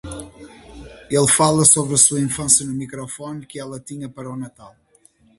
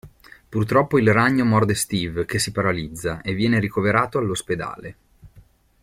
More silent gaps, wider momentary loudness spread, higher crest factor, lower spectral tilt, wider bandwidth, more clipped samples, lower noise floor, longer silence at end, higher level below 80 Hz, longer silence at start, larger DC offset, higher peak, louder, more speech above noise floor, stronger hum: neither; first, 20 LU vs 11 LU; about the same, 20 dB vs 18 dB; second, -3.5 dB/octave vs -5.5 dB/octave; second, 12 kHz vs 16.5 kHz; neither; first, -56 dBFS vs -52 dBFS; first, 0.7 s vs 0.45 s; about the same, -48 dBFS vs -48 dBFS; about the same, 0.05 s vs 0.05 s; neither; about the same, 0 dBFS vs -2 dBFS; first, -15 LUFS vs -21 LUFS; first, 36 dB vs 32 dB; neither